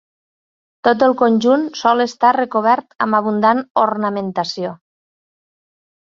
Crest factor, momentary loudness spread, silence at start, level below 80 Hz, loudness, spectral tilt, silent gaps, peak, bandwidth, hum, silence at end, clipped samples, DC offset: 16 dB; 8 LU; 0.85 s; -64 dBFS; -16 LUFS; -5.5 dB/octave; 2.95-2.99 s, 3.70-3.75 s; 0 dBFS; 7.4 kHz; none; 1.4 s; under 0.1%; under 0.1%